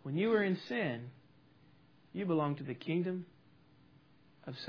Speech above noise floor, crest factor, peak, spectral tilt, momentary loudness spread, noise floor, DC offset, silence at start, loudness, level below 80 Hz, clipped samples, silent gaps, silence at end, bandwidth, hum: 30 dB; 20 dB; -18 dBFS; -5.5 dB/octave; 19 LU; -65 dBFS; under 0.1%; 0.05 s; -36 LUFS; -82 dBFS; under 0.1%; none; 0 s; 5.4 kHz; none